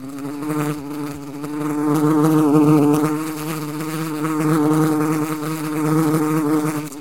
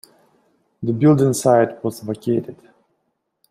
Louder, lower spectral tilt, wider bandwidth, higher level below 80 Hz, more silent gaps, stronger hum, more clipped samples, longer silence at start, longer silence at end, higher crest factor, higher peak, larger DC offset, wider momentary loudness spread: about the same, -19 LUFS vs -18 LUFS; about the same, -7 dB/octave vs -7 dB/octave; about the same, 17 kHz vs 15.5 kHz; about the same, -58 dBFS vs -60 dBFS; neither; neither; neither; second, 0 s vs 0.8 s; second, 0 s vs 0.95 s; about the same, 18 dB vs 18 dB; about the same, -2 dBFS vs -2 dBFS; first, 0.7% vs under 0.1%; about the same, 13 LU vs 13 LU